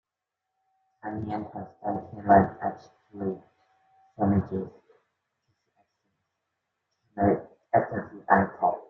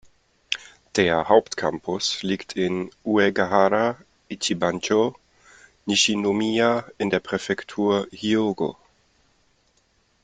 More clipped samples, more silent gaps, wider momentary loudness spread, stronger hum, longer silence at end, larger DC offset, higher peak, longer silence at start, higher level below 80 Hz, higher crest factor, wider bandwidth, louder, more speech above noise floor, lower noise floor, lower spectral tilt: neither; neither; first, 19 LU vs 10 LU; neither; second, 0.05 s vs 1.5 s; neither; about the same, -4 dBFS vs -2 dBFS; first, 1.05 s vs 0.5 s; about the same, -62 dBFS vs -60 dBFS; about the same, 24 dB vs 22 dB; second, 6 kHz vs 9.6 kHz; second, -27 LUFS vs -23 LUFS; first, 60 dB vs 42 dB; first, -86 dBFS vs -65 dBFS; first, -11 dB/octave vs -4 dB/octave